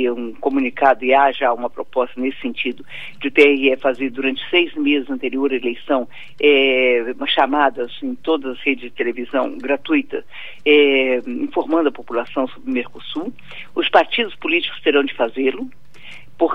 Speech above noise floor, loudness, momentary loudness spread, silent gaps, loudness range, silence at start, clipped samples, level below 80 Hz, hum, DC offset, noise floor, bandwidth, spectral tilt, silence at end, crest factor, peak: 23 dB; -18 LUFS; 13 LU; none; 3 LU; 0 s; under 0.1%; -60 dBFS; none; 2%; -42 dBFS; 6.2 kHz; -5 dB/octave; 0 s; 18 dB; 0 dBFS